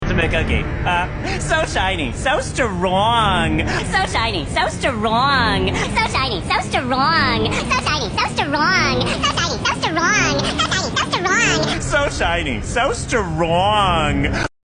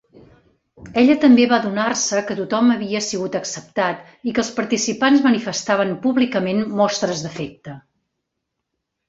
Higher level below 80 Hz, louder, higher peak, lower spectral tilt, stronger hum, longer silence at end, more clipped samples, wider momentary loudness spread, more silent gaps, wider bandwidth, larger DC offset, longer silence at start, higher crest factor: first, -30 dBFS vs -58 dBFS; about the same, -17 LUFS vs -18 LUFS; about the same, -2 dBFS vs -2 dBFS; about the same, -4 dB/octave vs -4 dB/octave; neither; second, 0.15 s vs 1.3 s; neither; second, 5 LU vs 12 LU; neither; first, 10.5 kHz vs 8 kHz; neither; second, 0 s vs 0.8 s; about the same, 16 dB vs 18 dB